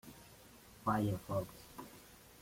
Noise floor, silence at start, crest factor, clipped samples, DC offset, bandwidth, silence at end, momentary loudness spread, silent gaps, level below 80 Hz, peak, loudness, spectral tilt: -60 dBFS; 0.05 s; 20 dB; under 0.1%; under 0.1%; 16.5 kHz; 0 s; 22 LU; none; -64 dBFS; -22 dBFS; -39 LUFS; -6.5 dB/octave